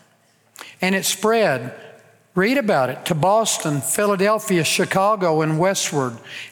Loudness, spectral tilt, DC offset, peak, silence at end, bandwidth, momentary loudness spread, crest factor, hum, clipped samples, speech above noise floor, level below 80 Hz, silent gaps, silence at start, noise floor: -19 LUFS; -4 dB/octave; under 0.1%; -4 dBFS; 0 s; 20 kHz; 8 LU; 16 dB; none; under 0.1%; 39 dB; -64 dBFS; none; 0.6 s; -59 dBFS